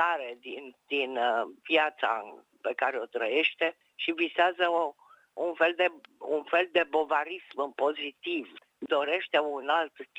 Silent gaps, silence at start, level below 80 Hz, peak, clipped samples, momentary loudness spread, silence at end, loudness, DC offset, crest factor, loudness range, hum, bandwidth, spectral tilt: none; 0 s; -86 dBFS; -10 dBFS; under 0.1%; 11 LU; 0.15 s; -29 LUFS; under 0.1%; 20 dB; 2 LU; none; 9.2 kHz; -3.5 dB/octave